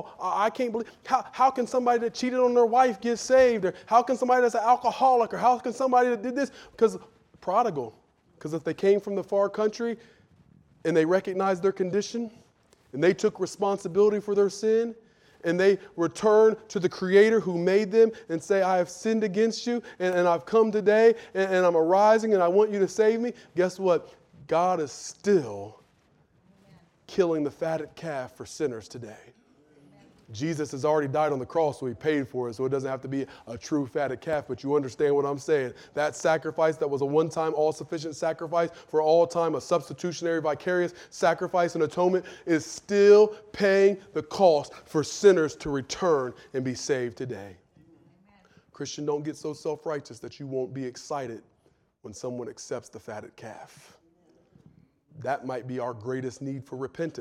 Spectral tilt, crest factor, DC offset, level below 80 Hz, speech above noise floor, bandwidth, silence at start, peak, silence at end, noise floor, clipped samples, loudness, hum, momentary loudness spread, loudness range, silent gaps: -5.5 dB/octave; 20 dB; under 0.1%; -66 dBFS; 41 dB; 12 kHz; 0 s; -6 dBFS; 0 s; -66 dBFS; under 0.1%; -25 LUFS; none; 15 LU; 13 LU; none